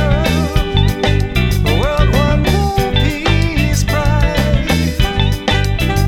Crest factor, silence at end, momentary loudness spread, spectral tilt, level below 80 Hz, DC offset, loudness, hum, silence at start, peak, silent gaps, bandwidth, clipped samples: 12 dB; 0 s; 2 LU; -5.5 dB/octave; -18 dBFS; under 0.1%; -14 LUFS; none; 0 s; 0 dBFS; none; 17.5 kHz; under 0.1%